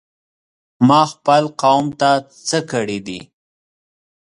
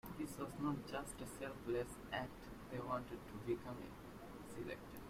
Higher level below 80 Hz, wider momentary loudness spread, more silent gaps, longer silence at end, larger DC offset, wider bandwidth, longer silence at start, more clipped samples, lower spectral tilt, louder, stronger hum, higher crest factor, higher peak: about the same, -60 dBFS vs -64 dBFS; about the same, 12 LU vs 10 LU; neither; first, 1.1 s vs 0 s; neither; second, 11 kHz vs 16 kHz; first, 0.8 s vs 0.05 s; neither; about the same, -5 dB/octave vs -5.5 dB/octave; first, -16 LUFS vs -47 LUFS; neither; about the same, 18 dB vs 18 dB; first, 0 dBFS vs -30 dBFS